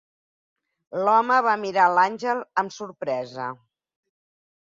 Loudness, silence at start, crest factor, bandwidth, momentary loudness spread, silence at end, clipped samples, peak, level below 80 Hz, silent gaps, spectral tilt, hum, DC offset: -22 LUFS; 0.9 s; 20 dB; 7.6 kHz; 14 LU; 1.25 s; under 0.1%; -6 dBFS; -76 dBFS; none; -4.5 dB/octave; none; under 0.1%